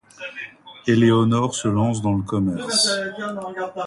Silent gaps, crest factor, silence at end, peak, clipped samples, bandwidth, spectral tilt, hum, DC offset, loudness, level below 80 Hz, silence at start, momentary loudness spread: none; 16 dB; 0 s; -4 dBFS; under 0.1%; 11.5 kHz; -5 dB/octave; none; under 0.1%; -20 LUFS; -50 dBFS; 0.2 s; 16 LU